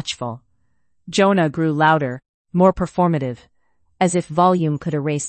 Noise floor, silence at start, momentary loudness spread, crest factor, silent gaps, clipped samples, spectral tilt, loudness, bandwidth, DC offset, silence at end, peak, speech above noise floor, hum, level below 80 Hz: -70 dBFS; 0.05 s; 12 LU; 18 dB; 2.29-2.45 s; under 0.1%; -6 dB/octave; -19 LUFS; 8.8 kHz; under 0.1%; 0 s; -2 dBFS; 52 dB; none; -48 dBFS